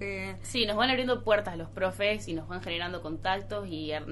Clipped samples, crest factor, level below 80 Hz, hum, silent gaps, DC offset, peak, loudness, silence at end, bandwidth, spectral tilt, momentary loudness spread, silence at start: under 0.1%; 18 dB; -48 dBFS; none; none; under 0.1%; -12 dBFS; -30 LUFS; 0 s; 11.5 kHz; -4.5 dB/octave; 10 LU; 0 s